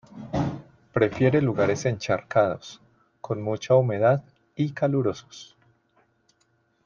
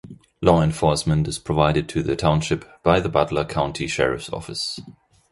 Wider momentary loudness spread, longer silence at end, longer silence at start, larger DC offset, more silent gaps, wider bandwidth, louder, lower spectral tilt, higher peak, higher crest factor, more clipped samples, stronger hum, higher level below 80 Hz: first, 20 LU vs 9 LU; first, 1.4 s vs 0.4 s; about the same, 0.15 s vs 0.05 s; neither; neither; second, 7.4 kHz vs 11.5 kHz; second, -24 LUFS vs -21 LUFS; first, -7 dB/octave vs -5.5 dB/octave; second, -8 dBFS vs -2 dBFS; about the same, 18 dB vs 20 dB; neither; neither; second, -58 dBFS vs -40 dBFS